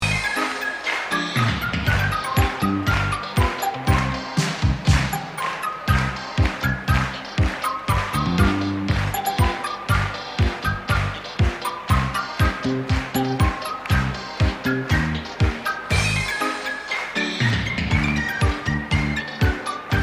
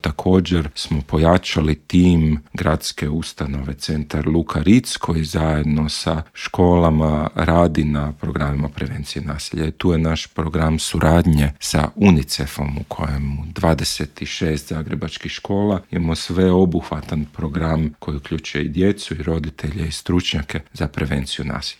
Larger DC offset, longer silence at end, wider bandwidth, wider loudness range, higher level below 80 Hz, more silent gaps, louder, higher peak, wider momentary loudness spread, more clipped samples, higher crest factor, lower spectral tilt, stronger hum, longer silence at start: neither; about the same, 0 s vs 0.05 s; about the same, 16 kHz vs 15.5 kHz; second, 1 LU vs 4 LU; about the same, -30 dBFS vs -32 dBFS; neither; about the same, -22 LUFS vs -20 LUFS; second, -4 dBFS vs 0 dBFS; second, 5 LU vs 11 LU; neither; about the same, 18 dB vs 18 dB; about the same, -5 dB/octave vs -6 dB/octave; neither; about the same, 0 s vs 0.05 s